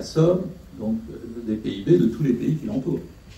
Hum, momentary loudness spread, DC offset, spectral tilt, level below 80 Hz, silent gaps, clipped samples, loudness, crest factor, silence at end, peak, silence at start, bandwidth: none; 13 LU; under 0.1%; -8 dB/octave; -48 dBFS; none; under 0.1%; -24 LUFS; 18 dB; 0 s; -6 dBFS; 0 s; 13.5 kHz